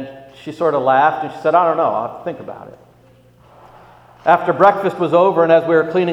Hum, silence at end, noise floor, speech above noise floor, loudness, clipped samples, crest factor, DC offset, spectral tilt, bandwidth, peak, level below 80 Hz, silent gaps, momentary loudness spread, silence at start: 60 Hz at -50 dBFS; 0 s; -49 dBFS; 34 dB; -15 LUFS; under 0.1%; 16 dB; under 0.1%; -7.5 dB/octave; 10 kHz; 0 dBFS; -60 dBFS; none; 20 LU; 0 s